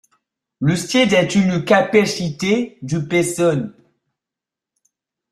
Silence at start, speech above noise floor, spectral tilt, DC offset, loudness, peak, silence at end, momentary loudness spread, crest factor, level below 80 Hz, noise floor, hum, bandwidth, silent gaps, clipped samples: 0.6 s; 70 dB; -5 dB/octave; under 0.1%; -17 LUFS; -2 dBFS; 1.6 s; 9 LU; 18 dB; -56 dBFS; -86 dBFS; none; 14 kHz; none; under 0.1%